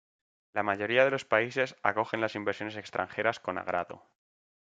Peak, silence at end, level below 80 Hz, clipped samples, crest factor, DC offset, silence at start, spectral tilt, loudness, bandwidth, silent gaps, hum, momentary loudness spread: -8 dBFS; 0.7 s; -76 dBFS; under 0.1%; 24 dB; under 0.1%; 0.55 s; -5 dB/octave; -30 LUFS; 7.8 kHz; none; none; 10 LU